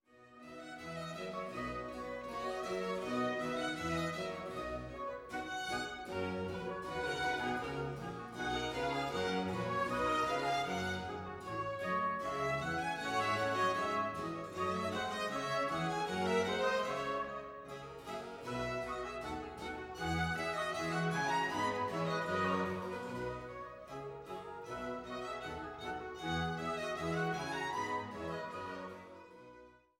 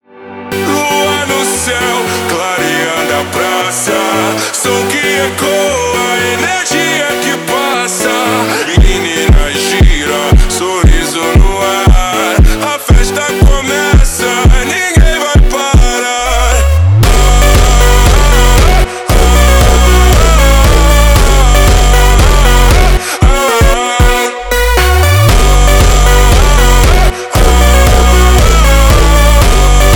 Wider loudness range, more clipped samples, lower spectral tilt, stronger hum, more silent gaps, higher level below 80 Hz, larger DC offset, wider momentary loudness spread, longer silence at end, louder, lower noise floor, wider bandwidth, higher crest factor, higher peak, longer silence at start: about the same, 5 LU vs 4 LU; neither; about the same, -5 dB/octave vs -4 dB/octave; neither; neither; second, -60 dBFS vs -10 dBFS; neither; first, 11 LU vs 5 LU; first, 0.25 s vs 0 s; second, -38 LUFS vs -9 LUFS; first, -59 dBFS vs -27 dBFS; second, 17 kHz vs 19.5 kHz; first, 18 dB vs 6 dB; second, -20 dBFS vs 0 dBFS; about the same, 0.15 s vs 0.2 s